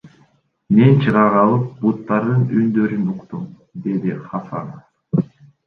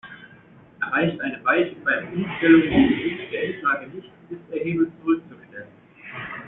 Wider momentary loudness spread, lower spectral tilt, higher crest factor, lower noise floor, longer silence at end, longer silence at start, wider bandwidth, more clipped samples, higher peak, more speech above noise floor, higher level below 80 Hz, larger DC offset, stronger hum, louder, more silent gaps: second, 17 LU vs 24 LU; first, -10.5 dB/octave vs -4.5 dB/octave; about the same, 16 dB vs 20 dB; first, -57 dBFS vs -50 dBFS; first, 0.4 s vs 0 s; about the same, 0.05 s vs 0.05 s; first, 4.5 kHz vs 3.9 kHz; neither; about the same, -2 dBFS vs -4 dBFS; first, 41 dB vs 27 dB; about the same, -56 dBFS vs -52 dBFS; neither; neither; first, -17 LUFS vs -22 LUFS; neither